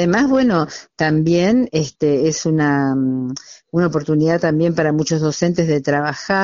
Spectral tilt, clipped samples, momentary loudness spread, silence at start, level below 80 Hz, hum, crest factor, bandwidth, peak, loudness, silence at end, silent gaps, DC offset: -6 dB/octave; under 0.1%; 6 LU; 0 s; -50 dBFS; none; 14 dB; 7.4 kHz; -2 dBFS; -17 LUFS; 0 s; none; under 0.1%